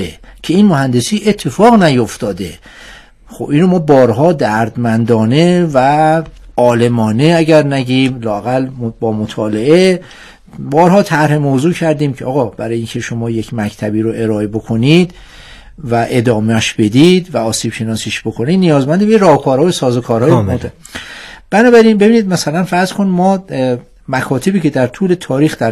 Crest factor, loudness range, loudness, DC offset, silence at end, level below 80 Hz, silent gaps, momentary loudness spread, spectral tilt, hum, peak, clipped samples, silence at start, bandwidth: 12 dB; 4 LU; -12 LUFS; under 0.1%; 0 s; -42 dBFS; none; 10 LU; -6 dB/octave; none; 0 dBFS; 0.8%; 0 s; 13.5 kHz